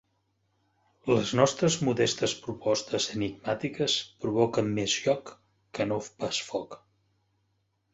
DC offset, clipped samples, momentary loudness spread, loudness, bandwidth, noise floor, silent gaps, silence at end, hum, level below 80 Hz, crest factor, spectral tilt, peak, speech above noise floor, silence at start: under 0.1%; under 0.1%; 8 LU; -28 LUFS; 8.4 kHz; -75 dBFS; none; 1.2 s; none; -62 dBFS; 24 dB; -4 dB/octave; -6 dBFS; 46 dB; 1.05 s